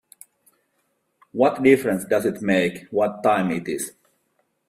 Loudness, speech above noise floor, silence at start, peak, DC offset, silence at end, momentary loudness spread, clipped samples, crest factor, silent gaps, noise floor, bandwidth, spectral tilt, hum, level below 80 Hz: -21 LUFS; 50 dB; 1.35 s; -2 dBFS; under 0.1%; 0.8 s; 11 LU; under 0.1%; 22 dB; none; -71 dBFS; 15.5 kHz; -5.5 dB/octave; none; -62 dBFS